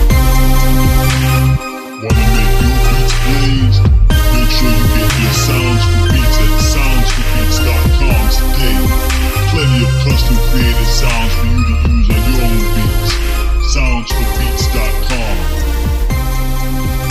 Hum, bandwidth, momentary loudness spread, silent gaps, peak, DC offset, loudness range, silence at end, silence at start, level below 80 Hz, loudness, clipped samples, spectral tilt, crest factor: none; 15.5 kHz; 5 LU; none; 0 dBFS; under 0.1%; 4 LU; 0 s; 0 s; -12 dBFS; -13 LUFS; under 0.1%; -5 dB/octave; 10 dB